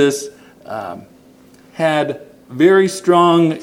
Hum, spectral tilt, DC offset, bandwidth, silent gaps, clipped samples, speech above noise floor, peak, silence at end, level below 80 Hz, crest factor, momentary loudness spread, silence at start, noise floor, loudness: none; -5.5 dB/octave; under 0.1%; 15.5 kHz; none; under 0.1%; 31 dB; 0 dBFS; 0 s; -64 dBFS; 16 dB; 22 LU; 0 s; -46 dBFS; -14 LUFS